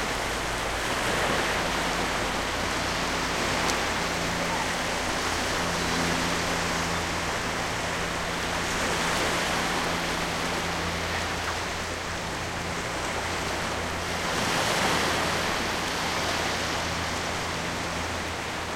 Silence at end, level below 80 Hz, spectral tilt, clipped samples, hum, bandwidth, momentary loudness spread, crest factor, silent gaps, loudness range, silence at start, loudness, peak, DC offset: 0 s; -44 dBFS; -3 dB/octave; under 0.1%; none; 16.5 kHz; 5 LU; 20 dB; none; 3 LU; 0 s; -27 LUFS; -8 dBFS; under 0.1%